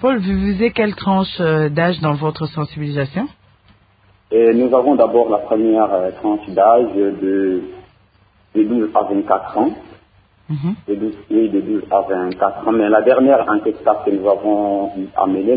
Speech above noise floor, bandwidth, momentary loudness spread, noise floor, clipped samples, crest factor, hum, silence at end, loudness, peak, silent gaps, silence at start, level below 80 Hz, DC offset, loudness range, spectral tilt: 38 dB; 5 kHz; 10 LU; -54 dBFS; under 0.1%; 16 dB; none; 0 s; -16 LUFS; 0 dBFS; none; 0 s; -46 dBFS; under 0.1%; 5 LU; -12.5 dB/octave